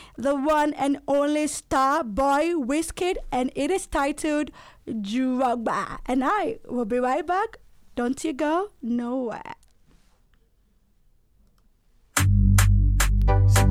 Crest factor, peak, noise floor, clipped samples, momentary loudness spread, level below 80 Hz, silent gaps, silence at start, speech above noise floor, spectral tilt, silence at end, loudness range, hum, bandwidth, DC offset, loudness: 18 dB; -6 dBFS; -62 dBFS; under 0.1%; 10 LU; -30 dBFS; none; 0 s; 38 dB; -5.5 dB/octave; 0 s; 7 LU; none; 16 kHz; under 0.1%; -24 LUFS